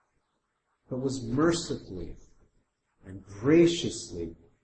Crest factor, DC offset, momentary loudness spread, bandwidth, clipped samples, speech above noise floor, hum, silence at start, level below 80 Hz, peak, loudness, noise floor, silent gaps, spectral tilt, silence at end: 20 dB; under 0.1%; 24 LU; 8.8 kHz; under 0.1%; 50 dB; none; 0.9 s; -52 dBFS; -10 dBFS; -28 LUFS; -78 dBFS; none; -5.5 dB/octave; 0.3 s